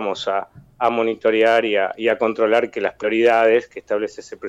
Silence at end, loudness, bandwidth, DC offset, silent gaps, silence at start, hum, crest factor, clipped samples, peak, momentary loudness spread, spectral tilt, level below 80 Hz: 0 s; -19 LUFS; 8.6 kHz; under 0.1%; none; 0 s; none; 14 dB; under 0.1%; -6 dBFS; 9 LU; -4.5 dB/octave; -62 dBFS